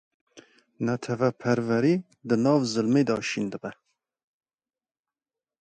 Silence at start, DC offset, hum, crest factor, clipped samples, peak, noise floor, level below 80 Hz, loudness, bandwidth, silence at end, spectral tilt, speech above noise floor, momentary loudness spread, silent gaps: 0.35 s; under 0.1%; none; 18 dB; under 0.1%; -8 dBFS; under -90 dBFS; -68 dBFS; -25 LUFS; 9.2 kHz; 1.9 s; -6 dB/octave; over 65 dB; 9 LU; none